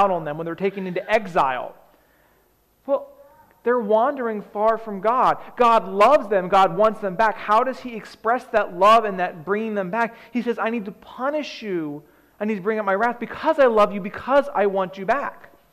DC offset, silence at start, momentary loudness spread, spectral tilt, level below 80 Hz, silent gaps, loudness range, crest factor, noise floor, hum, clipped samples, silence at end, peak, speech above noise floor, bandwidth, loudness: under 0.1%; 0 s; 12 LU; -6 dB/octave; -58 dBFS; none; 7 LU; 14 dB; -61 dBFS; none; under 0.1%; 0.4 s; -8 dBFS; 40 dB; 14.5 kHz; -21 LUFS